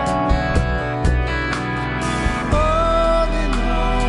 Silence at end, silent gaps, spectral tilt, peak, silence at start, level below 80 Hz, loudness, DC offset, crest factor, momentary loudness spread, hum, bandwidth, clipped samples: 0 s; none; -6 dB/octave; -4 dBFS; 0 s; -22 dBFS; -19 LUFS; under 0.1%; 14 dB; 5 LU; none; 11.5 kHz; under 0.1%